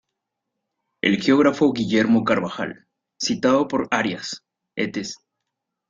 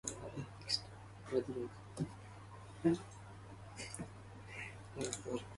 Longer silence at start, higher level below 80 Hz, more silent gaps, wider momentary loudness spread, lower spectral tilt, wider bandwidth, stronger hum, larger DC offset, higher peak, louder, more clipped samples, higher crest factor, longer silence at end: first, 1.05 s vs 0.05 s; about the same, -60 dBFS vs -64 dBFS; neither; about the same, 15 LU vs 17 LU; about the same, -5 dB/octave vs -4.5 dB/octave; second, 7.8 kHz vs 11.5 kHz; neither; neither; first, -2 dBFS vs -20 dBFS; first, -21 LUFS vs -42 LUFS; neither; about the same, 20 dB vs 22 dB; first, 0.75 s vs 0 s